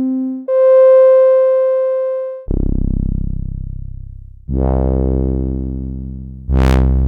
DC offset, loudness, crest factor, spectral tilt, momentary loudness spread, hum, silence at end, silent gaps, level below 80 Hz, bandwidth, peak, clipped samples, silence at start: under 0.1%; -14 LUFS; 12 dB; -9.5 dB/octave; 20 LU; none; 0 s; none; -20 dBFS; 6.8 kHz; -2 dBFS; under 0.1%; 0 s